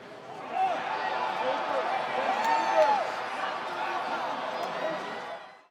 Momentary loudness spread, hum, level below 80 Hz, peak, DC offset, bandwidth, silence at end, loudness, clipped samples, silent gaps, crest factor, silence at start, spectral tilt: 12 LU; none; -82 dBFS; -10 dBFS; under 0.1%; 17.5 kHz; 0.15 s; -29 LUFS; under 0.1%; none; 18 dB; 0 s; -3 dB/octave